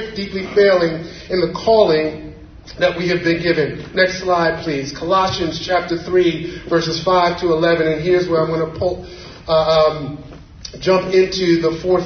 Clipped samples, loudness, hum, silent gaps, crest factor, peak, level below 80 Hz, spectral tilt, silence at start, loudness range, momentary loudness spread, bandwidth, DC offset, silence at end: under 0.1%; -17 LUFS; none; none; 16 dB; 0 dBFS; -42 dBFS; -5.5 dB/octave; 0 s; 1 LU; 13 LU; 6.6 kHz; under 0.1%; 0 s